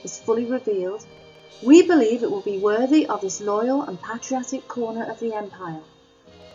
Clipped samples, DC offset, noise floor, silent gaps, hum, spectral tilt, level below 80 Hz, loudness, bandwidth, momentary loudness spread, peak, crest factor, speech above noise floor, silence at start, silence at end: under 0.1%; under 0.1%; -51 dBFS; none; none; -4.5 dB/octave; -70 dBFS; -21 LUFS; 7.6 kHz; 17 LU; -2 dBFS; 20 dB; 29 dB; 0.05 s; 0.05 s